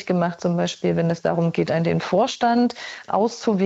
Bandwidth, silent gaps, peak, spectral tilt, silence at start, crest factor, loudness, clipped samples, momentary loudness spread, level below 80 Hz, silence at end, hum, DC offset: 8 kHz; none; -8 dBFS; -6.5 dB/octave; 0 s; 14 dB; -22 LUFS; under 0.1%; 4 LU; -60 dBFS; 0 s; none; under 0.1%